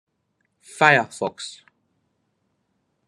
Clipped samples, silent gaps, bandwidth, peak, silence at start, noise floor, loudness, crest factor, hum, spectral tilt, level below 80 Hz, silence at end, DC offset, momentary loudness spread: under 0.1%; none; 12.5 kHz; 0 dBFS; 0.75 s; -72 dBFS; -19 LUFS; 26 dB; none; -4 dB/octave; -76 dBFS; 1.55 s; under 0.1%; 20 LU